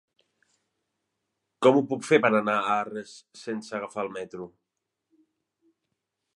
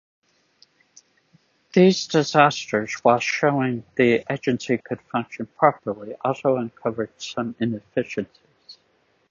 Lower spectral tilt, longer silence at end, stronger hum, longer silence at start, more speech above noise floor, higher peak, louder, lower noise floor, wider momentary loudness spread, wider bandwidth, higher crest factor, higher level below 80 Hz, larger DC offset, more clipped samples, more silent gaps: about the same, -5.5 dB/octave vs -5.5 dB/octave; first, 1.9 s vs 0.6 s; neither; second, 1.6 s vs 1.75 s; first, 58 dB vs 43 dB; second, -6 dBFS vs 0 dBFS; second, -25 LUFS vs -22 LUFS; first, -84 dBFS vs -65 dBFS; first, 20 LU vs 12 LU; first, 11.5 kHz vs 7.6 kHz; about the same, 24 dB vs 22 dB; second, -78 dBFS vs -64 dBFS; neither; neither; neither